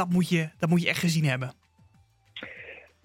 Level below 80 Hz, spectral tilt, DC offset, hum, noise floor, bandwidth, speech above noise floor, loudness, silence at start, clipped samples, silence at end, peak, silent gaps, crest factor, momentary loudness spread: -66 dBFS; -5.5 dB/octave; under 0.1%; none; -62 dBFS; 16.5 kHz; 36 dB; -26 LUFS; 0 s; under 0.1%; 0.25 s; -8 dBFS; none; 20 dB; 19 LU